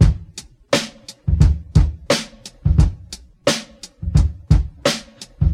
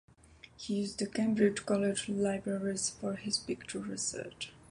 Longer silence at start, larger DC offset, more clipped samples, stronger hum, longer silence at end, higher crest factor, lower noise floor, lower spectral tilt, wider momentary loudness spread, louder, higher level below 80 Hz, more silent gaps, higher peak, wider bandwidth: second, 0 s vs 0.45 s; neither; neither; neither; about the same, 0 s vs 0.1 s; about the same, 18 dB vs 20 dB; second, -39 dBFS vs -58 dBFS; first, -5.5 dB/octave vs -4 dB/octave; first, 18 LU vs 10 LU; first, -20 LUFS vs -34 LUFS; first, -22 dBFS vs -64 dBFS; neither; first, 0 dBFS vs -14 dBFS; first, 14.5 kHz vs 11.5 kHz